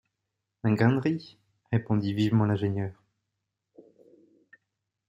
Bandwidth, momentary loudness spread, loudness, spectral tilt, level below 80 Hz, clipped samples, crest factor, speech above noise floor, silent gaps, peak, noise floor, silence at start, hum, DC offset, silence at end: 7.6 kHz; 10 LU; -27 LUFS; -8.5 dB/octave; -66 dBFS; under 0.1%; 20 dB; 58 dB; none; -8 dBFS; -84 dBFS; 0.65 s; none; under 0.1%; 2.15 s